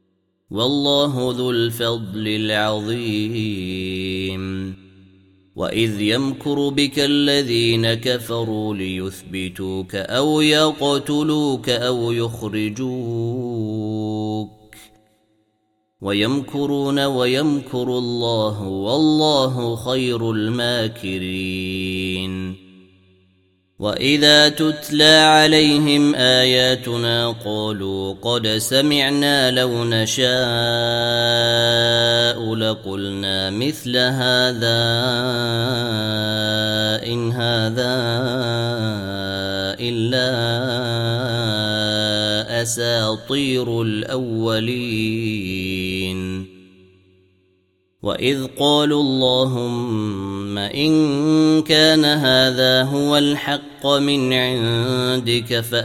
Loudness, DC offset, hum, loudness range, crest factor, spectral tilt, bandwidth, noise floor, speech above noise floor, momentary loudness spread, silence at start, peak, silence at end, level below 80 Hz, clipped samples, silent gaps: -18 LUFS; under 0.1%; none; 9 LU; 20 dB; -4.5 dB/octave; 16.5 kHz; -68 dBFS; 49 dB; 10 LU; 0.5 s; 0 dBFS; 0 s; -54 dBFS; under 0.1%; none